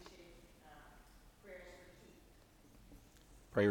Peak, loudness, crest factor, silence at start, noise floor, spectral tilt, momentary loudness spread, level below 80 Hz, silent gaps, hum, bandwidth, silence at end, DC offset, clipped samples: -22 dBFS; -44 LUFS; 22 dB; 0.2 s; -64 dBFS; -6.5 dB/octave; 14 LU; -66 dBFS; none; none; 19.5 kHz; 0 s; under 0.1%; under 0.1%